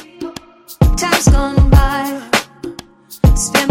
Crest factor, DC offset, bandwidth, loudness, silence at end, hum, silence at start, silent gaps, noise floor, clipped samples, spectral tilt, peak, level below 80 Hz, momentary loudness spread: 14 dB; under 0.1%; 17 kHz; -14 LUFS; 0 s; none; 0.2 s; none; -37 dBFS; under 0.1%; -5 dB/octave; 0 dBFS; -18 dBFS; 18 LU